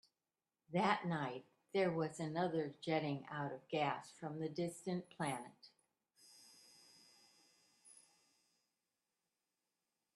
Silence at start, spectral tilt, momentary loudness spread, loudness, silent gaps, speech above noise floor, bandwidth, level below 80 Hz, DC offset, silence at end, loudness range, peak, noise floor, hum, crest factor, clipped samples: 0.7 s; -6 dB/octave; 22 LU; -41 LUFS; none; over 49 dB; 12.5 kHz; -84 dBFS; under 0.1%; 2.25 s; 10 LU; -18 dBFS; under -90 dBFS; none; 26 dB; under 0.1%